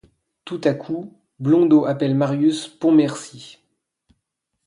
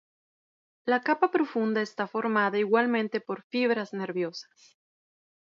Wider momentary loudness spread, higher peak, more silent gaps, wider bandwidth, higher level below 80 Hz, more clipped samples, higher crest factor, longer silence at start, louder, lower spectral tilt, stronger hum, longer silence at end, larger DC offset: first, 18 LU vs 9 LU; first, -4 dBFS vs -8 dBFS; second, none vs 3.44-3.50 s; first, 11 kHz vs 7.4 kHz; first, -66 dBFS vs -82 dBFS; neither; about the same, 16 dB vs 20 dB; second, 0.45 s vs 0.85 s; first, -19 LUFS vs -28 LUFS; about the same, -7 dB/octave vs -6 dB/octave; neither; first, 1.2 s vs 1.05 s; neither